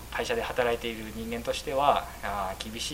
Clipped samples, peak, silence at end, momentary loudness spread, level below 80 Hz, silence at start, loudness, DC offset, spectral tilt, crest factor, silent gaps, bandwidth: under 0.1%; -6 dBFS; 0 s; 9 LU; -46 dBFS; 0 s; -30 LUFS; under 0.1%; -3.5 dB/octave; 24 dB; none; 16 kHz